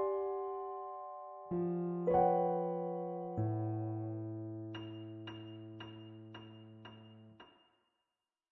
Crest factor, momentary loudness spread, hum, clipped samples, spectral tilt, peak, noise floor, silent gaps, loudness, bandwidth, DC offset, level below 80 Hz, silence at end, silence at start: 20 dB; 22 LU; none; under 0.1%; -7.5 dB/octave; -20 dBFS; under -90 dBFS; none; -38 LUFS; 4.2 kHz; under 0.1%; -72 dBFS; 1 s; 0 s